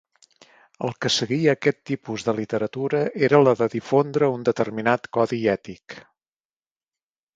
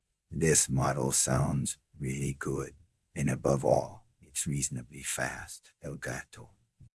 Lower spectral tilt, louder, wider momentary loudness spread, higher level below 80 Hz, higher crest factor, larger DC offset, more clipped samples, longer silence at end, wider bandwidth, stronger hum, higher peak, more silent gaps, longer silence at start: about the same, -5.5 dB/octave vs -4.5 dB/octave; first, -22 LUFS vs -30 LUFS; second, 12 LU vs 18 LU; second, -64 dBFS vs -52 dBFS; about the same, 22 dB vs 22 dB; neither; neither; first, 1.35 s vs 0.15 s; second, 8 kHz vs 12 kHz; neither; first, -2 dBFS vs -10 dBFS; neither; first, 0.8 s vs 0.3 s